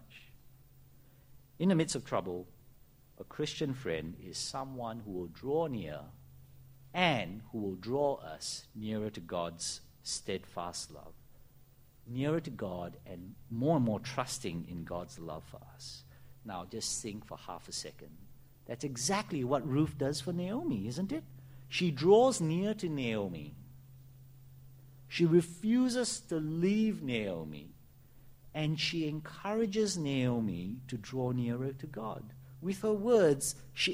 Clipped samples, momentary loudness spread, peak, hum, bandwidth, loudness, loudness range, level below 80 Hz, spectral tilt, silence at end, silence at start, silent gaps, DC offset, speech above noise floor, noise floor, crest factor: under 0.1%; 17 LU; -12 dBFS; none; 16 kHz; -34 LUFS; 8 LU; -62 dBFS; -5 dB/octave; 0 s; 0.05 s; none; under 0.1%; 26 dB; -60 dBFS; 24 dB